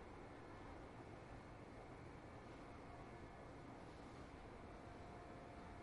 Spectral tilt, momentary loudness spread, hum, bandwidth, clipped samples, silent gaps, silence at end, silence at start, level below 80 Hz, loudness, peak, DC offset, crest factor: -6.5 dB/octave; 1 LU; none; 11 kHz; under 0.1%; none; 0 s; 0 s; -66 dBFS; -58 LUFS; -44 dBFS; under 0.1%; 14 dB